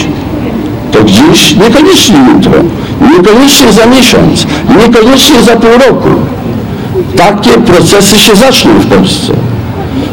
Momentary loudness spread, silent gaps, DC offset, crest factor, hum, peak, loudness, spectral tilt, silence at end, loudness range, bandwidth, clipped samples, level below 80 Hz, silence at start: 11 LU; none; under 0.1%; 4 dB; none; 0 dBFS; -4 LUFS; -4.5 dB/octave; 0 s; 2 LU; over 20 kHz; 20%; -26 dBFS; 0 s